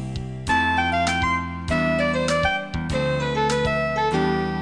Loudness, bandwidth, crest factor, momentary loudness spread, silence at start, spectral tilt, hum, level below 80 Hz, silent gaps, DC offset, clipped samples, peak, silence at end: -22 LUFS; 10.5 kHz; 16 dB; 5 LU; 0 s; -5 dB/octave; none; -38 dBFS; none; 0.4%; under 0.1%; -8 dBFS; 0 s